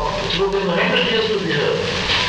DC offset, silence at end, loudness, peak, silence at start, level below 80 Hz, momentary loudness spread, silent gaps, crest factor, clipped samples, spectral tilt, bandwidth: under 0.1%; 0 s; -18 LUFS; -6 dBFS; 0 s; -38 dBFS; 3 LU; none; 14 dB; under 0.1%; -4 dB/octave; 10.5 kHz